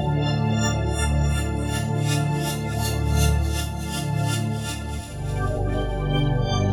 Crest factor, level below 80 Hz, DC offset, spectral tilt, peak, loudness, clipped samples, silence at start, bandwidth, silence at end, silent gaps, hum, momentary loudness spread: 14 dB; -30 dBFS; under 0.1%; -5.5 dB/octave; -8 dBFS; -24 LUFS; under 0.1%; 0 s; 18 kHz; 0 s; none; none; 6 LU